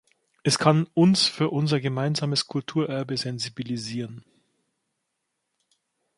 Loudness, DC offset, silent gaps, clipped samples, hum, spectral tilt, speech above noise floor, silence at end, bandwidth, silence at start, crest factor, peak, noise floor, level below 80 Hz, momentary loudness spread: -24 LUFS; under 0.1%; none; under 0.1%; none; -5 dB/octave; 55 dB; 2 s; 11.5 kHz; 0.45 s; 22 dB; -4 dBFS; -79 dBFS; -66 dBFS; 11 LU